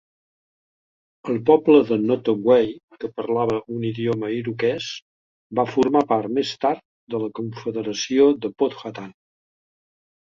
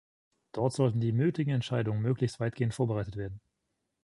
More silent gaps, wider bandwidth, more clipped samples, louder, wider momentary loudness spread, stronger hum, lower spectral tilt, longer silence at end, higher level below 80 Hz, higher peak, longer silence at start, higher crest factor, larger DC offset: first, 2.83-2.88 s, 5.02-5.50 s, 6.85-7.07 s vs none; second, 7.4 kHz vs 11.5 kHz; neither; first, -21 LUFS vs -31 LUFS; first, 15 LU vs 12 LU; neither; second, -6 dB/octave vs -7.5 dB/octave; first, 1.15 s vs 0.65 s; about the same, -62 dBFS vs -58 dBFS; first, -2 dBFS vs -14 dBFS; first, 1.25 s vs 0.55 s; about the same, 20 dB vs 18 dB; neither